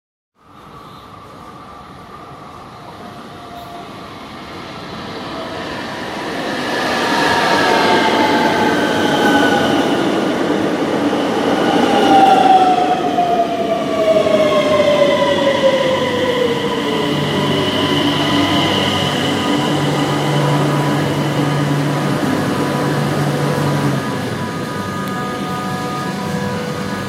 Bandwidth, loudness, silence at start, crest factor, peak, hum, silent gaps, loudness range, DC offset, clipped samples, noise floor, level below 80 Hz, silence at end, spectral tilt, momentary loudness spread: 16 kHz; -15 LUFS; 0.55 s; 16 dB; 0 dBFS; none; none; 17 LU; under 0.1%; under 0.1%; -39 dBFS; -50 dBFS; 0 s; -5 dB/octave; 20 LU